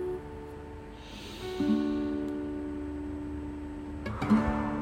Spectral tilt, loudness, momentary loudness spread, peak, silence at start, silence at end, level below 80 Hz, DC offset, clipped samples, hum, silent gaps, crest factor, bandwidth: -7.5 dB/octave; -33 LUFS; 16 LU; -14 dBFS; 0 s; 0 s; -46 dBFS; under 0.1%; under 0.1%; none; none; 20 dB; 15 kHz